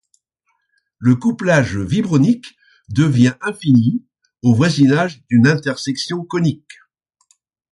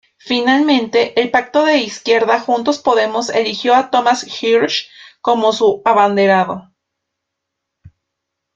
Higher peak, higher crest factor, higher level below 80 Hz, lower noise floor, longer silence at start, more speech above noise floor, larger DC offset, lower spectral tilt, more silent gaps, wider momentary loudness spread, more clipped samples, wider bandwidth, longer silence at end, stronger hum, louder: about the same, -2 dBFS vs 0 dBFS; about the same, 16 dB vs 14 dB; first, -48 dBFS vs -62 dBFS; second, -69 dBFS vs -77 dBFS; first, 1 s vs 0.25 s; second, 54 dB vs 63 dB; neither; first, -6.5 dB/octave vs -4 dB/octave; neither; first, 9 LU vs 5 LU; neither; first, 11.5 kHz vs 7.8 kHz; first, 1.2 s vs 0.65 s; neither; about the same, -16 LUFS vs -14 LUFS